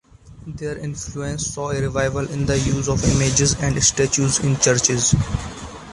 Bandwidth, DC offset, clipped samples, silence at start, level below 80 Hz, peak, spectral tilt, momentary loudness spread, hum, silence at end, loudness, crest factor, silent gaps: 11.5 kHz; under 0.1%; under 0.1%; 0.25 s; -34 dBFS; -2 dBFS; -4 dB/octave; 12 LU; none; 0 s; -19 LUFS; 18 dB; none